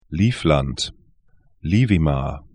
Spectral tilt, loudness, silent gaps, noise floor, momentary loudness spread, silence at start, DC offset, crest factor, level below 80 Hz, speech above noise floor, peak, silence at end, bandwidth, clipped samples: -6.5 dB/octave; -20 LUFS; none; -58 dBFS; 10 LU; 0.1 s; 0.1%; 18 dB; -34 dBFS; 38 dB; -4 dBFS; 0.15 s; 10.5 kHz; under 0.1%